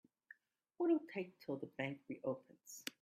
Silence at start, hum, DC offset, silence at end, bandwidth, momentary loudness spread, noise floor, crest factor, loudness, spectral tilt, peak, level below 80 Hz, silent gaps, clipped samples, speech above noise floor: 0.8 s; none; under 0.1%; 0.1 s; 15.5 kHz; 26 LU; -66 dBFS; 20 dB; -43 LUFS; -5.5 dB/octave; -24 dBFS; -88 dBFS; none; under 0.1%; 24 dB